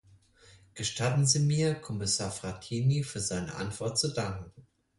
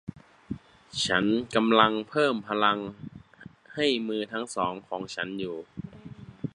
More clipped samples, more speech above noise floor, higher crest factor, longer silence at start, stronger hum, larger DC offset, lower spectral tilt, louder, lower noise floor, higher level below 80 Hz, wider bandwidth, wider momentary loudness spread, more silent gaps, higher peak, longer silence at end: neither; first, 29 dB vs 24 dB; second, 20 dB vs 26 dB; first, 0.75 s vs 0.05 s; neither; neither; about the same, -4 dB/octave vs -4.5 dB/octave; second, -30 LUFS vs -27 LUFS; first, -59 dBFS vs -50 dBFS; about the same, -56 dBFS vs -60 dBFS; about the same, 11.5 kHz vs 11 kHz; second, 12 LU vs 20 LU; neither; second, -12 dBFS vs -4 dBFS; first, 0.35 s vs 0.05 s